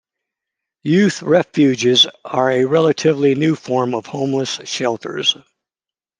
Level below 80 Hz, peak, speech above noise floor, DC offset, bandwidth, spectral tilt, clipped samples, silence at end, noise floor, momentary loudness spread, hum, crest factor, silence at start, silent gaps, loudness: -64 dBFS; -2 dBFS; 74 dB; under 0.1%; 10 kHz; -4.5 dB/octave; under 0.1%; 0.85 s; -90 dBFS; 8 LU; none; 16 dB; 0.85 s; none; -16 LUFS